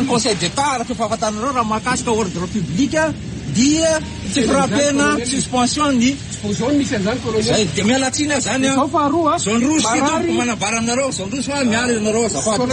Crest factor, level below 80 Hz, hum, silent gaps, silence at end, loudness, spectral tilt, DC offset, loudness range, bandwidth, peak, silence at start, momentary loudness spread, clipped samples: 14 dB; -40 dBFS; none; none; 0 s; -17 LUFS; -4 dB/octave; under 0.1%; 2 LU; 10 kHz; -4 dBFS; 0 s; 6 LU; under 0.1%